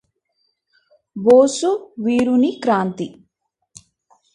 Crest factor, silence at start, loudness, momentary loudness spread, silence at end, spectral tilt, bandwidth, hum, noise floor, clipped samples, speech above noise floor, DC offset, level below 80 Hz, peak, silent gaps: 18 dB; 1.15 s; -17 LUFS; 17 LU; 1.25 s; -5.5 dB/octave; 11 kHz; none; -73 dBFS; under 0.1%; 57 dB; under 0.1%; -62 dBFS; -2 dBFS; none